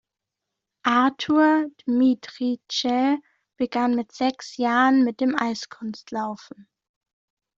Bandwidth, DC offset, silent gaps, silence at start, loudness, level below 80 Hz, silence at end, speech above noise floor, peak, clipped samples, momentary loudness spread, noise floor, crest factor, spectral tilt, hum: 7.6 kHz; under 0.1%; none; 0.85 s; -23 LUFS; -70 dBFS; 1.2 s; 62 dB; -4 dBFS; under 0.1%; 12 LU; -85 dBFS; 18 dB; -4 dB/octave; none